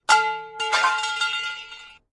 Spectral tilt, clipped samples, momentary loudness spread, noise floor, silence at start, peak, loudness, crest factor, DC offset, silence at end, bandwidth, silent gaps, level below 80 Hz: 1.5 dB/octave; under 0.1%; 17 LU; -43 dBFS; 0.1 s; -4 dBFS; -22 LUFS; 20 dB; under 0.1%; 0.2 s; 11.5 kHz; none; -66 dBFS